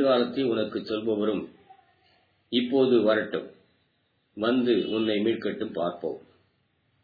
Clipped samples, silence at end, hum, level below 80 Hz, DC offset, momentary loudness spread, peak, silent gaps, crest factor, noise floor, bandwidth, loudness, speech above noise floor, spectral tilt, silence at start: under 0.1%; 0.85 s; none; -72 dBFS; under 0.1%; 13 LU; -10 dBFS; none; 18 dB; -71 dBFS; 4.9 kHz; -26 LUFS; 46 dB; -8.5 dB/octave; 0 s